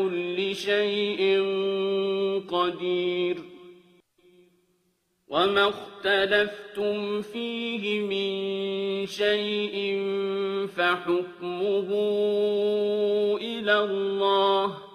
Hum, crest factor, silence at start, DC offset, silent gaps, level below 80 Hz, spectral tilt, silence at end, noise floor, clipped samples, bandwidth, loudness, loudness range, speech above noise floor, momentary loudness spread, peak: none; 18 dB; 0 s; under 0.1%; none; -70 dBFS; -5 dB/octave; 0 s; -72 dBFS; under 0.1%; 13.5 kHz; -26 LUFS; 4 LU; 46 dB; 7 LU; -8 dBFS